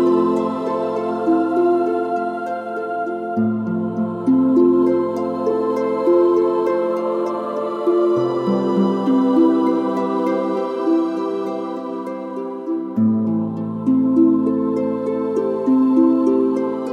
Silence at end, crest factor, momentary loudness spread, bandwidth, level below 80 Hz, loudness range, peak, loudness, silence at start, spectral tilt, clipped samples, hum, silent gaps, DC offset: 0 s; 14 dB; 9 LU; 7 kHz; -70 dBFS; 4 LU; -4 dBFS; -19 LUFS; 0 s; -8.5 dB/octave; under 0.1%; none; none; under 0.1%